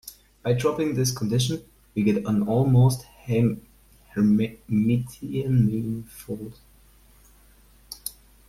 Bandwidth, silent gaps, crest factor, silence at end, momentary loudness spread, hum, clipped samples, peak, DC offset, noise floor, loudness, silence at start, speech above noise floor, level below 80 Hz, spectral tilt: 15.5 kHz; none; 16 dB; 0.4 s; 15 LU; 50 Hz at -55 dBFS; under 0.1%; -10 dBFS; under 0.1%; -55 dBFS; -24 LUFS; 0.05 s; 32 dB; -50 dBFS; -6.5 dB/octave